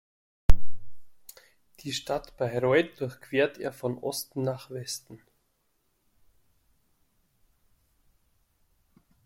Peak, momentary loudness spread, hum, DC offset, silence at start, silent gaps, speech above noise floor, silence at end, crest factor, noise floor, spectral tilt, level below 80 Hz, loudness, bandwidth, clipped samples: -2 dBFS; 16 LU; none; under 0.1%; 0.5 s; none; 43 dB; 4.1 s; 24 dB; -73 dBFS; -5 dB/octave; -38 dBFS; -31 LUFS; 16 kHz; under 0.1%